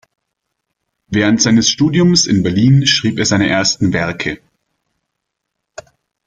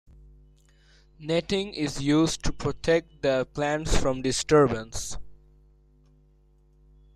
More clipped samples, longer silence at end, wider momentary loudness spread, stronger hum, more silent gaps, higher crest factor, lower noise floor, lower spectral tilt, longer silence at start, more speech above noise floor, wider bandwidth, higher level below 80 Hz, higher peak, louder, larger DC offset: neither; about the same, 1.9 s vs 1.8 s; second, 9 LU vs 13 LU; second, none vs 50 Hz at -50 dBFS; neither; about the same, 16 dB vs 18 dB; first, -76 dBFS vs -60 dBFS; about the same, -4 dB/octave vs -4.5 dB/octave; about the same, 1.1 s vs 1.2 s; first, 63 dB vs 35 dB; second, 9.4 kHz vs 14 kHz; second, -46 dBFS vs -38 dBFS; first, 0 dBFS vs -10 dBFS; first, -13 LUFS vs -26 LUFS; neither